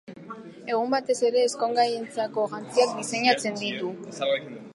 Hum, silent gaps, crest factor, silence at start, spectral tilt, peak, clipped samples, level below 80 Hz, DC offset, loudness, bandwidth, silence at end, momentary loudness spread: none; none; 18 dB; 0.1 s; -3 dB/octave; -8 dBFS; under 0.1%; -78 dBFS; under 0.1%; -26 LUFS; 11.5 kHz; 0 s; 11 LU